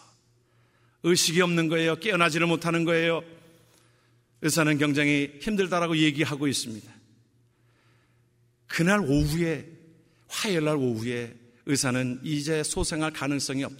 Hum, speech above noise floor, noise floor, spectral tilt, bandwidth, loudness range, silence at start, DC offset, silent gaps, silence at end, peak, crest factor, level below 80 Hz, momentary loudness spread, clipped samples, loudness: none; 39 dB; -65 dBFS; -4.5 dB/octave; 16 kHz; 5 LU; 1.05 s; under 0.1%; none; 0 s; -6 dBFS; 20 dB; -48 dBFS; 9 LU; under 0.1%; -25 LUFS